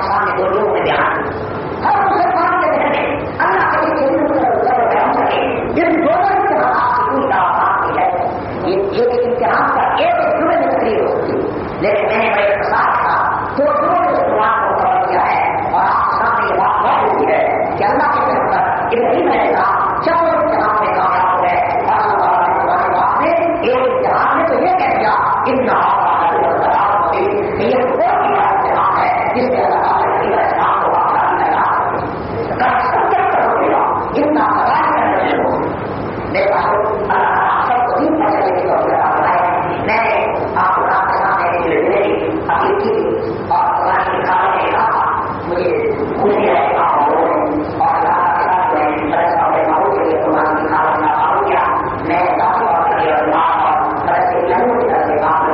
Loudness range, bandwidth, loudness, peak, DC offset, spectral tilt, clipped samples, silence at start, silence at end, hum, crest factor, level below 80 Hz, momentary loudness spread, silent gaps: 1 LU; 5.8 kHz; -14 LUFS; -4 dBFS; under 0.1%; -4 dB/octave; under 0.1%; 0 s; 0 s; none; 10 dB; -44 dBFS; 3 LU; none